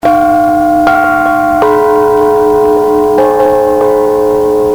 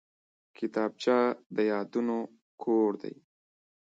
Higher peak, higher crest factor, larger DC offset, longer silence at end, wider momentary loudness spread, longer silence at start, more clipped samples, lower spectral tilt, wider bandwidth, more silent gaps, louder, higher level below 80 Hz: first, 0 dBFS vs -14 dBFS; second, 8 dB vs 16 dB; neither; second, 0 s vs 0.85 s; second, 1 LU vs 12 LU; second, 0.05 s vs 0.6 s; neither; about the same, -6 dB/octave vs -6 dB/octave; first, over 20 kHz vs 7.8 kHz; second, none vs 1.46-1.50 s, 2.42-2.58 s; first, -8 LUFS vs -30 LUFS; first, -36 dBFS vs -84 dBFS